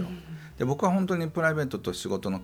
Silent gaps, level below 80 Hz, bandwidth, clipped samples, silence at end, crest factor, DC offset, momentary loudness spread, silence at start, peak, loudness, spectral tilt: none; -56 dBFS; 15.5 kHz; under 0.1%; 0 s; 18 dB; under 0.1%; 11 LU; 0 s; -10 dBFS; -28 LUFS; -6 dB/octave